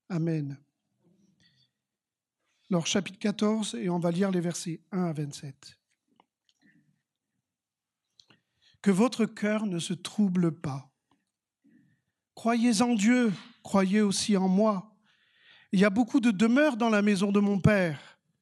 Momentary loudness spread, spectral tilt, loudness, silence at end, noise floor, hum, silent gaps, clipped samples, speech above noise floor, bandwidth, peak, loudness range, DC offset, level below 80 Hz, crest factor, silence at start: 12 LU; -5.5 dB/octave; -27 LUFS; 0.4 s; under -90 dBFS; none; none; under 0.1%; over 64 dB; 12 kHz; -10 dBFS; 9 LU; under 0.1%; -66 dBFS; 20 dB; 0.1 s